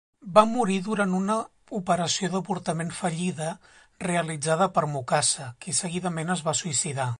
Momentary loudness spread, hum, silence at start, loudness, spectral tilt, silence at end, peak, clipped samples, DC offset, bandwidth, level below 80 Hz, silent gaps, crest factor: 8 LU; none; 0.25 s; -26 LUFS; -4 dB/octave; 0.05 s; -4 dBFS; under 0.1%; under 0.1%; 11.5 kHz; -64 dBFS; none; 22 dB